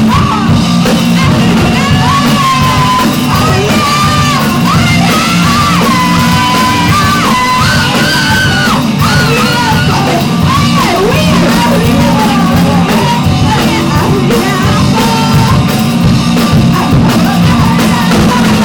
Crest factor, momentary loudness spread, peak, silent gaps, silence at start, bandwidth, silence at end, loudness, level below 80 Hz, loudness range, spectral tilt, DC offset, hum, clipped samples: 8 dB; 1 LU; 0 dBFS; none; 0 s; 18 kHz; 0 s; -8 LUFS; -26 dBFS; 1 LU; -5 dB/octave; under 0.1%; none; under 0.1%